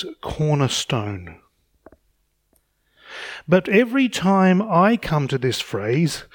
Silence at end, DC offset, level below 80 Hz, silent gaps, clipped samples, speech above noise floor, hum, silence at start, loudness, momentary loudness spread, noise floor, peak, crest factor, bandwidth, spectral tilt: 0.1 s; under 0.1%; -50 dBFS; none; under 0.1%; 47 dB; none; 0 s; -19 LUFS; 16 LU; -67 dBFS; -4 dBFS; 18 dB; 18 kHz; -5.5 dB/octave